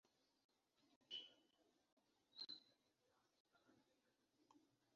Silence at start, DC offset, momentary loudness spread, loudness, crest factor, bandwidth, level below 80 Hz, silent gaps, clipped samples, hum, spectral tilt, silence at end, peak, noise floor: 0.8 s; under 0.1%; 10 LU; -57 LUFS; 24 dB; 7 kHz; under -90 dBFS; 0.96-1.01 s, 1.92-1.97 s, 3.40-3.45 s; under 0.1%; none; 1 dB/octave; 0.3 s; -44 dBFS; -86 dBFS